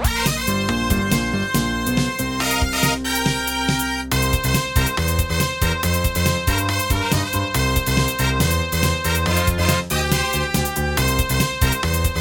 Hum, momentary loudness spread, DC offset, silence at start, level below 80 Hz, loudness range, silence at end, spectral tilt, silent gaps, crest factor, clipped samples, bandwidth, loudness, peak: none; 2 LU; under 0.1%; 0 s; -28 dBFS; 1 LU; 0 s; -4 dB/octave; none; 18 dB; under 0.1%; 17.5 kHz; -20 LUFS; -2 dBFS